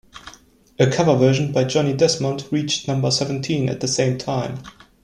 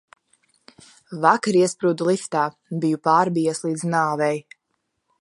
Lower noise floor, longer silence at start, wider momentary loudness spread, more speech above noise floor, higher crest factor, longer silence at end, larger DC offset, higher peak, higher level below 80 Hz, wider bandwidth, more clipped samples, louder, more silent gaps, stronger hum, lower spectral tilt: second, -50 dBFS vs -75 dBFS; second, 0.15 s vs 1.1 s; about the same, 9 LU vs 7 LU; second, 30 dB vs 54 dB; about the same, 18 dB vs 20 dB; second, 0.35 s vs 0.8 s; neither; about the same, -2 dBFS vs -2 dBFS; first, -54 dBFS vs -72 dBFS; about the same, 11.5 kHz vs 11.5 kHz; neither; about the same, -20 LUFS vs -21 LUFS; neither; neither; about the same, -5 dB/octave vs -5.5 dB/octave